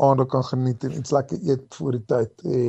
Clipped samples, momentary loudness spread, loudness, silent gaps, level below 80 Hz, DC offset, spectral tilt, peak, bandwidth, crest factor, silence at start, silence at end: under 0.1%; 6 LU; -24 LUFS; none; -58 dBFS; under 0.1%; -8 dB/octave; -4 dBFS; 8.2 kHz; 18 dB; 0 s; 0 s